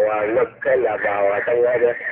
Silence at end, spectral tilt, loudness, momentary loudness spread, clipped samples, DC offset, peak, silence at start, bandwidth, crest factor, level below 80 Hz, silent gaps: 0 s; -9 dB/octave; -19 LUFS; 3 LU; under 0.1%; under 0.1%; -6 dBFS; 0 s; 4 kHz; 12 dB; -58 dBFS; none